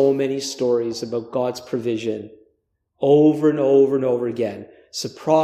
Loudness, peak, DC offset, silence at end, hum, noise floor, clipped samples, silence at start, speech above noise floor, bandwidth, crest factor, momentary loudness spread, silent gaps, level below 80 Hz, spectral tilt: -20 LUFS; -4 dBFS; under 0.1%; 0 s; none; -70 dBFS; under 0.1%; 0 s; 51 dB; 14.5 kHz; 16 dB; 13 LU; none; -68 dBFS; -6 dB/octave